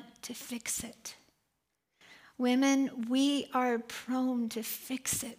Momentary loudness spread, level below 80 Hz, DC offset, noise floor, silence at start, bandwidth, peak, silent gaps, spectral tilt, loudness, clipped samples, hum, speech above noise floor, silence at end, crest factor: 15 LU; -70 dBFS; under 0.1%; -82 dBFS; 0 s; 16 kHz; -18 dBFS; none; -2.5 dB/octave; -32 LUFS; under 0.1%; none; 50 dB; 0.05 s; 16 dB